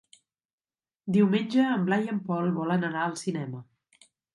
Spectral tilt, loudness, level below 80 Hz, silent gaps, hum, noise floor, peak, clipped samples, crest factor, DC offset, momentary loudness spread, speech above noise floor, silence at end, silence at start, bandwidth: -6.5 dB/octave; -27 LUFS; -72 dBFS; none; none; under -90 dBFS; -12 dBFS; under 0.1%; 18 dB; under 0.1%; 12 LU; over 64 dB; 0.7 s; 1.05 s; 11.5 kHz